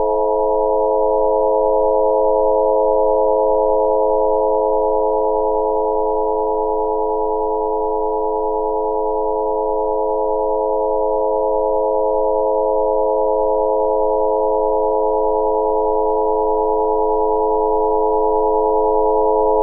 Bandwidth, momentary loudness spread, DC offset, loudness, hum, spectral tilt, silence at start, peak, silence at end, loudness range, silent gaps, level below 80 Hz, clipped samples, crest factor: 1.1 kHz; 4 LU; under 0.1%; -17 LUFS; none; 8 dB/octave; 0 s; -4 dBFS; 0 s; 3 LU; none; -36 dBFS; under 0.1%; 12 dB